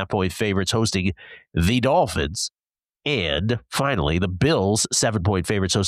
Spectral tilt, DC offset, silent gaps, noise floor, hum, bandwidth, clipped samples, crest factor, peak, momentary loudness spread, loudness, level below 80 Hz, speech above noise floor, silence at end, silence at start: -4.5 dB/octave; under 0.1%; none; -65 dBFS; none; 14.5 kHz; under 0.1%; 14 dB; -8 dBFS; 8 LU; -22 LUFS; -40 dBFS; 43 dB; 0 s; 0 s